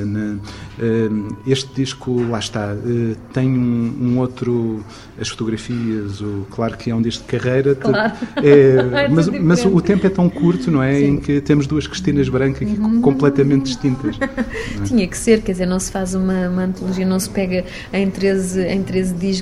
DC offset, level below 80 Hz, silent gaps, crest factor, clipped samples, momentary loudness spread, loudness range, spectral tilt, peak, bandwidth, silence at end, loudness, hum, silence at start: under 0.1%; -38 dBFS; none; 16 dB; under 0.1%; 9 LU; 7 LU; -6.5 dB/octave; 0 dBFS; 13.5 kHz; 0 s; -18 LUFS; none; 0 s